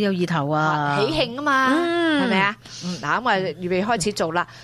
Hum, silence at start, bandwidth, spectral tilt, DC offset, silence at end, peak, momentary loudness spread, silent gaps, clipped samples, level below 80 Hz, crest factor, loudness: none; 0 s; 13.5 kHz; -5 dB/octave; under 0.1%; 0 s; -6 dBFS; 5 LU; none; under 0.1%; -52 dBFS; 16 dB; -21 LUFS